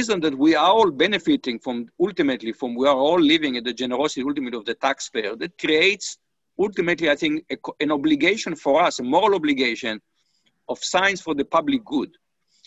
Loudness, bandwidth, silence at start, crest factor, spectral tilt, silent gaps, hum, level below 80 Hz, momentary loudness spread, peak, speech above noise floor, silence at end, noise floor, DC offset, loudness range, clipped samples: -21 LUFS; 8.4 kHz; 0 s; 18 dB; -3.5 dB/octave; none; none; -60 dBFS; 11 LU; -4 dBFS; 47 dB; 0.6 s; -68 dBFS; under 0.1%; 3 LU; under 0.1%